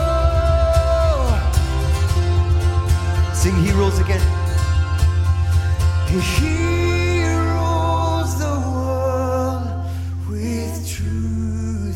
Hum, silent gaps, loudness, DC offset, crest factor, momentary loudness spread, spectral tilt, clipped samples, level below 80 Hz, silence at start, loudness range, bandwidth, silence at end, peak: none; none; -19 LUFS; under 0.1%; 14 dB; 7 LU; -6 dB/octave; under 0.1%; -22 dBFS; 0 s; 4 LU; 14.5 kHz; 0 s; -4 dBFS